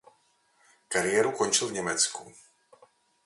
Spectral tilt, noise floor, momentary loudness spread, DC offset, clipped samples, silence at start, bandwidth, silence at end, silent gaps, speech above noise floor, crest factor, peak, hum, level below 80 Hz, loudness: -1.5 dB/octave; -68 dBFS; 6 LU; under 0.1%; under 0.1%; 0.9 s; 11.5 kHz; 0.95 s; none; 40 dB; 22 dB; -10 dBFS; none; -68 dBFS; -26 LUFS